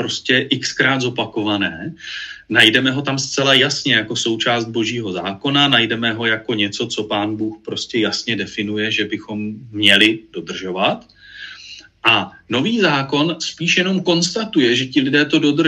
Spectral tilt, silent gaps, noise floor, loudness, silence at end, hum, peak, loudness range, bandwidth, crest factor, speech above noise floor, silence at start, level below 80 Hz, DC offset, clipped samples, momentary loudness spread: -3.5 dB/octave; none; -39 dBFS; -17 LUFS; 0 s; none; 0 dBFS; 4 LU; 15 kHz; 18 dB; 22 dB; 0 s; -58 dBFS; under 0.1%; under 0.1%; 14 LU